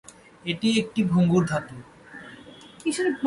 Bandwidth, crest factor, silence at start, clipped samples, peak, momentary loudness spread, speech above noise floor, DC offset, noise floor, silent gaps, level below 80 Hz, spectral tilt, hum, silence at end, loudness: 11.5 kHz; 16 dB; 0.45 s; under 0.1%; -10 dBFS; 23 LU; 23 dB; under 0.1%; -46 dBFS; none; -58 dBFS; -6 dB/octave; none; 0 s; -24 LUFS